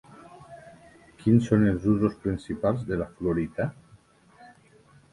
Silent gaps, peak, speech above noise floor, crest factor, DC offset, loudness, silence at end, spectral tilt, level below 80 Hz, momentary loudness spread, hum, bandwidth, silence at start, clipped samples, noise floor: none; -8 dBFS; 32 dB; 20 dB; under 0.1%; -26 LUFS; 0.65 s; -9 dB/octave; -50 dBFS; 24 LU; none; 11 kHz; 0.3 s; under 0.1%; -57 dBFS